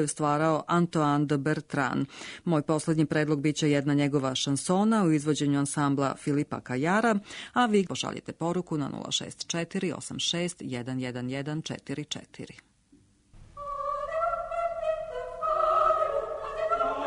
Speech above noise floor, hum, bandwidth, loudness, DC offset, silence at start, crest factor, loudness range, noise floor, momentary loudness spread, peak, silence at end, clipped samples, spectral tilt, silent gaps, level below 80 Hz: 34 dB; none; 11 kHz; -28 LUFS; under 0.1%; 0 s; 16 dB; 8 LU; -62 dBFS; 10 LU; -12 dBFS; 0 s; under 0.1%; -5 dB/octave; none; -58 dBFS